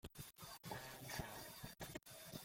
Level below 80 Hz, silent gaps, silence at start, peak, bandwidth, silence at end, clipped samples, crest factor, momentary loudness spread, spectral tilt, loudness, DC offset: -68 dBFS; none; 0.05 s; -34 dBFS; 16.5 kHz; 0 s; under 0.1%; 20 dB; 6 LU; -3.5 dB/octave; -52 LUFS; under 0.1%